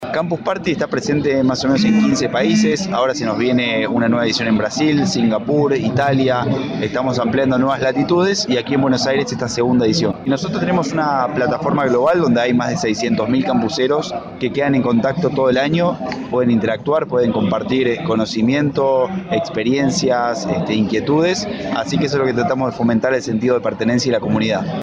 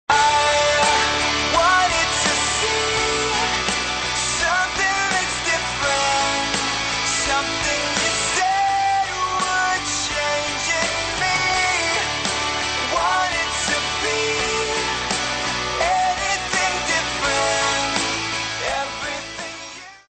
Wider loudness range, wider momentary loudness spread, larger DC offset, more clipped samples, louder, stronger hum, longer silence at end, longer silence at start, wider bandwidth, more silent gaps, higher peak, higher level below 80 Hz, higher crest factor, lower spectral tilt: about the same, 1 LU vs 2 LU; about the same, 5 LU vs 5 LU; neither; neither; about the same, -17 LUFS vs -19 LUFS; neither; second, 0 s vs 0.2 s; about the same, 0 s vs 0.1 s; about the same, 9.4 kHz vs 8.8 kHz; neither; about the same, -4 dBFS vs -4 dBFS; second, -48 dBFS vs -42 dBFS; about the same, 12 dB vs 16 dB; first, -5.5 dB/octave vs -1 dB/octave